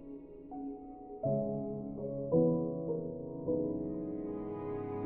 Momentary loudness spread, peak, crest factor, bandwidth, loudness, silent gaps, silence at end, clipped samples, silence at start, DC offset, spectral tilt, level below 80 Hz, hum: 15 LU; -18 dBFS; 18 dB; 3.1 kHz; -36 LUFS; none; 0 s; under 0.1%; 0 s; under 0.1%; -12.5 dB/octave; -60 dBFS; none